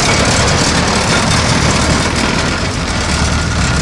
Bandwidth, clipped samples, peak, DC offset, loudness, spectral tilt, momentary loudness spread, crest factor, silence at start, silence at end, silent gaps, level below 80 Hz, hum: 11.5 kHz; under 0.1%; -2 dBFS; under 0.1%; -12 LUFS; -3.5 dB/octave; 4 LU; 12 dB; 0 s; 0 s; none; -22 dBFS; none